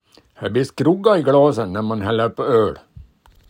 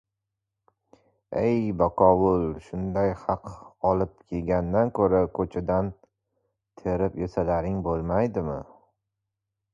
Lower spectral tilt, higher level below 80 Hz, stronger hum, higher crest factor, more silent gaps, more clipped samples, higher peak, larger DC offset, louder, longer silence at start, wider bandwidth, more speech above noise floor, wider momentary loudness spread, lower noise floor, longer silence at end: second, -7.5 dB/octave vs -10 dB/octave; second, -52 dBFS vs -44 dBFS; neither; about the same, 18 dB vs 22 dB; neither; neither; about the same, -2 dBFS vs -4 dBFS; neither; first, -18 LUFS vs -26 LUFS; second, 0.4 s vs 1.3 s; first, 16 kHz vs 7.4 kHz; second, 29 dB vs 60 dB; about the same, 9 LU vs 11 LU; second, -46 dBFS vs -84 dBFS; second, 0.45 s vs 1.1 s